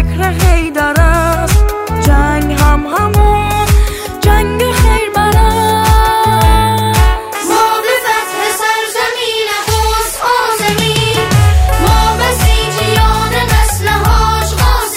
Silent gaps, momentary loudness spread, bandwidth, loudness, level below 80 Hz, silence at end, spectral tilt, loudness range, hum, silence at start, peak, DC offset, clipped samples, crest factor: none; 4 LU; 16.5 kHz; -11 LUFS; -14 dBFS; 0 s; -4.5 dB/octave; 2 LU; none; 0 s; 0 dBFS; under 0.1%; under 0.1%; 10 dB